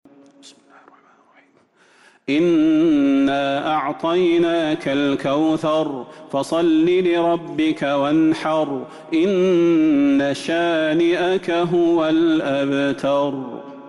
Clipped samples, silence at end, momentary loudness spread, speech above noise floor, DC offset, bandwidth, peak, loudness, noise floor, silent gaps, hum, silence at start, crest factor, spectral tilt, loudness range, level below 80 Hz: under 0.1%; 0 s; 7 LU; 38 dB; under 0.1%; 11.5 kHz; -10 dBFS; -18 LUFS; -56 dBFS; none; none; 0.45 s; 8 dB; -6 dB/octave; 2 LU; -58 dBFS